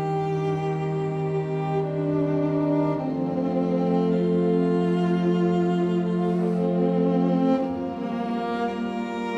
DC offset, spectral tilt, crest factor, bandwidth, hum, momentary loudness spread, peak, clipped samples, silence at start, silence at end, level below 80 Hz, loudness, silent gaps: under 0.1%; -9 dB/octave; 12 dB; 7.8 kHz; none; 5 LU; -10 dBFS; under 0.1%; 0 s; 0 s; -58 dBFS; -24 LUFS; none